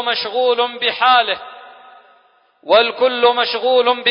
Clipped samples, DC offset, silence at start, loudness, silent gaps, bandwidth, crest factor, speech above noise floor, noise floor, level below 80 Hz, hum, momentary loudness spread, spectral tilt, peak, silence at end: under 0.1%; under 0.1%; 0 s; -15 LUFS; none; 5.4 kHz; 16 dB; 39 dB; -55 dBFS; -64 dBFS; none; 6 LU; -6 dB/octave; -2 dBFS; 0 s